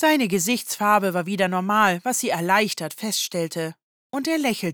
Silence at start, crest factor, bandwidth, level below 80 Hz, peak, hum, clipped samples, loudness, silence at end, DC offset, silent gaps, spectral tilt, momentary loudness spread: 0 s; 16 dB; over 20 kHz; -72 dBFS; -6 dBFS; none; under 0.1%; -22 LUFS; 0 s; under 0.1%; 3.83-4.10 s; -3.5 dB/octave; 9 LU